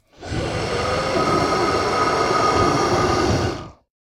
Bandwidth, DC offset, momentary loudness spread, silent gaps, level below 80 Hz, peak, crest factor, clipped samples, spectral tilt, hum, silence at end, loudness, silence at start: 16.5 kHz; under 0.1%; 8 LU; none; -38 dBFS; -6 dBFS; 14 dB; under 0.1%; -5 dB/octave; none; 0.3 s; -20 LUFS; 0.2 s